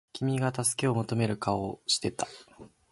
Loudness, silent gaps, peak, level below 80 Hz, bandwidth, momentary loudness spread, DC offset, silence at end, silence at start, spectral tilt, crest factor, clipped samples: -30 LUFS; none; -12 dBFS; -60 dBFS; 12 kHz; 9 LU; under 0.1%; 0.25 s; 0.15 s; -4.5 dB/octave; 18 dB; under 0.1%